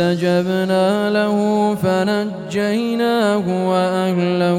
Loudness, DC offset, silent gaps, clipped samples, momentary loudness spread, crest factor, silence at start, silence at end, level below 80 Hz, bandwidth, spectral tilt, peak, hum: -17 LUFS; under 0.1%; none; under 0.1%; 3 LU; 12 dB; 0 s; 0 s; -58 dBFS; 16 kHz; -6.5 dB/octave; -4 dBFS; none